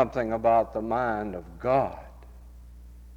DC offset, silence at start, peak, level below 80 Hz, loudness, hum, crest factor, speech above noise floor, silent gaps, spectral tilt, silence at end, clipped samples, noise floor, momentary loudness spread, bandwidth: under 0.1%; 0 s; -8 dBFS; -46 dBFS; -27 LUFS; 60 Hz at -45 dBFS; 20 dB; 21 dB; none; -8 dB/octave; 0 s; under 0.1%; -46 dBFS; 13 LU; 8.8 kHz